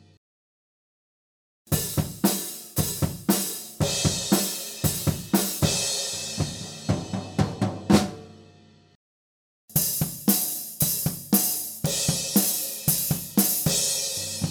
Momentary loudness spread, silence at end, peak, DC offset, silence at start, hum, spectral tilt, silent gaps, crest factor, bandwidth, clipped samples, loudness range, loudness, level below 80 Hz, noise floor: 8 LU; 0 s; -4 dBFS; under 0.1%; 1.7 s; none; -3.5 dB/octave; 8.95-9.68 s; 22 dB; over 20 kHz; under 0.1%; 5 LU; -24 LUFS; -48 dBFS; -54 dBFS